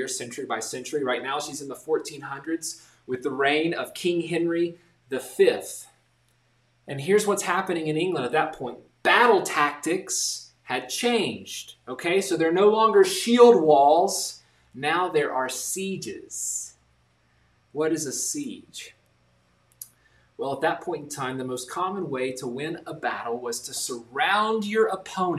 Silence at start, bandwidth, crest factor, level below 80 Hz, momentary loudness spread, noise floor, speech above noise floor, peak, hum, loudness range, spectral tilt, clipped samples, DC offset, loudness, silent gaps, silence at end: 0 s; 15 kHz; 22 dB; -70 dBFS; 17 LU; -66 dBFS; 41 dB; -4 dBFS; none; 12 LU; -3.5 dB/octave; under 0.1%; under 0.1%; -24 LUFS; none; 0 s